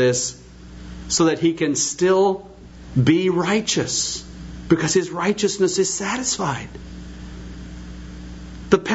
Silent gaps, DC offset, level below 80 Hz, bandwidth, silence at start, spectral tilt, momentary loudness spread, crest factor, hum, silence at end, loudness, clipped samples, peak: none; under 0.1%; -42 dBFS; 8 kHz; 0 s; -4 dB/octave; 20 LU; 22 dB; none; 0 s; -20 LUFS; under 0.1%; 0 dBFS